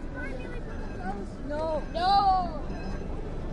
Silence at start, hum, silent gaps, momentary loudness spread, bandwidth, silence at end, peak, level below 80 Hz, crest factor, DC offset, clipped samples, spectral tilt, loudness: 0 s; none; none; 15 LU; 10.5 kHz; 0 s; -14 dBFS; -36 dBFS; 16 dB; under 0.1%; under 0.1%; -6.5 dB/octave; -30 LUFS